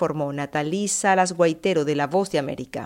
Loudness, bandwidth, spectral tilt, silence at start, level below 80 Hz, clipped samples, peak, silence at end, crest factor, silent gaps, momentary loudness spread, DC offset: -22 LUFS; 16 kHz; -4.5 dB/octave; 0 s; -60 dBFS; under 0.1%; -6 dBFS; 0 s; 16 dB; none; 7 LU; under 0.1%